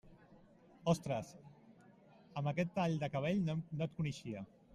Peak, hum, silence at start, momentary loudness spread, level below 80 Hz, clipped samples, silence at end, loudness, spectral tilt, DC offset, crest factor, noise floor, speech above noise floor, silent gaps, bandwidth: -20 dBFS; none; 0.05 s; 12 LU; -70 dBFS; under 0.1%; 0.3 s; -39 LUFS; -7 dB/octave; under 0.1%; 20 dB; -63 dBFS; 26 dB; none; 12.5 kHz